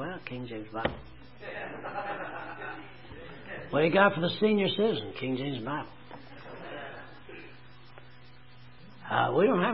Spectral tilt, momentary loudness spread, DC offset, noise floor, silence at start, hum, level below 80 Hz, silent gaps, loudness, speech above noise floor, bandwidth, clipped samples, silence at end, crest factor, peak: -9.5 dB/octave; 22 LU; 0.3%; -54 dBFS; 0 s; none; -60 dBFS; none; -30 LUFS; 26 dB; 5.8 kHz; under 0.1%; 0 s; 24 dB; -8 dBFS